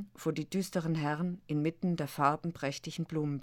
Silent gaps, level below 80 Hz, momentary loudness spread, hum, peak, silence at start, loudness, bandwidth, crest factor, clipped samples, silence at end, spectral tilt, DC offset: none; -66 dBFS; 7 LU; none; -14 dBFS; 0 s; -34 LUFS; 17.5 kHz; 20 dB; under 0.1%; 0 s; -6.5 dB/octave; under 0.1%